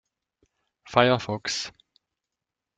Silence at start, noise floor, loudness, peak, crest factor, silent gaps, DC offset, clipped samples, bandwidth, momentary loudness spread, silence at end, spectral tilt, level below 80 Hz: 0.85 s; -87 dBFS; -24 LUFS; -2 dBFS; 26 dB; none; under 0.1%; under 0.1%; 9.4 kHz; 10 LU; 1.1 s; -4 dB/octave; -62 dBFS